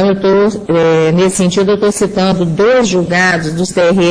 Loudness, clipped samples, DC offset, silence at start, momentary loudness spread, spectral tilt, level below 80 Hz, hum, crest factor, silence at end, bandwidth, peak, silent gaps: -11 LUFS; under 0.1%; under 0.1%; 0 s; 3 LU; -5 dB/octave; -40 dBFS; none; 10 dB; 0 s; 10.5 kHz; 0 dBFS; none